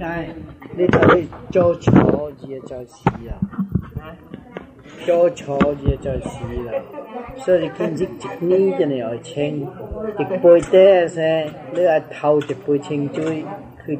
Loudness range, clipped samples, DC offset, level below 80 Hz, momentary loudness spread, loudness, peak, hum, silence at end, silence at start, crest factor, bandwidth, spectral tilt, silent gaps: 6 LU; under 0.1%; under 0.1%; -38 dBFS; 20 LU; -18 LUFS; 0 dBFS; none; 0 s; 0 s; 18 dB; 9.2 kHz; -7.5 dB/octave; none